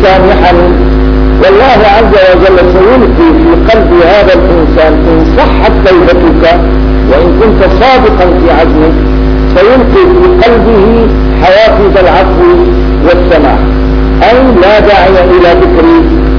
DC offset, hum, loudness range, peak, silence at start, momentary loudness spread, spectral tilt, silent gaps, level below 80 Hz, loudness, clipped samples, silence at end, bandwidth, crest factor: 2%; none; 1 LU; 0 dBFS; 0 s; 4 LU; -8 dB/octave; none; -10 dBFS; -4 LUFS; 8%; 0 s; 5.4 kHz; 4 dB